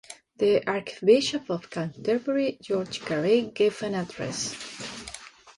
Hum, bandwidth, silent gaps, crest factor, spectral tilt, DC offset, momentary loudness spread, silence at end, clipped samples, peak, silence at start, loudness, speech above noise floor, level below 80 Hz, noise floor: none; 11.5 kHz; none; 20 dB; -4.5 dB/octave; under 0.1%; 15 LU; 0.05 s; under 0.1%; -8 dBFS; 0.1 s; -26 LUFS; 19 dB; -64 dBFS; -45 dBFS